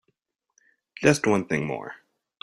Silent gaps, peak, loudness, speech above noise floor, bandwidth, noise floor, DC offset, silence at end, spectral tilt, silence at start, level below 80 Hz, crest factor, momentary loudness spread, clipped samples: none; -4 dBFS; -24 LUFS; 51 dB; 14.5 kHz; -74 dBFS; under 0.1%; 0.45 s; -5.5 dB/octave; 1 s; -60 dBFS; 24 dB; 14 LU; under 0.1%